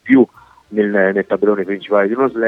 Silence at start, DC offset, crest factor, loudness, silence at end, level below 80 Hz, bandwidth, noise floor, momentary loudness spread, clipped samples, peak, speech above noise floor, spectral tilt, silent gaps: 0.05 s; under 0.1%; 16 dB; -16 LUFS; 0 s; -62 dBFS; 4 kHz; -39 dBFS; 6 LU; under 0.1%; 0 dBFS; 23 dB; -8.5 dB/octave; none